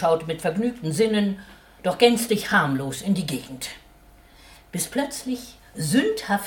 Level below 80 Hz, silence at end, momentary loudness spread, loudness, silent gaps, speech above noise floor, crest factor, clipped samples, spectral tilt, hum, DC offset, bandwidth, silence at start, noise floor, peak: -54 dBFS; 0 s; 15 LU; -24 LUFS; none; 28 dB; 20 dB; under 0.1%; -4.5 dB/octave; none; under 0.1%; 19 kHz; 0 s; -51 dBFS; -4 dBFS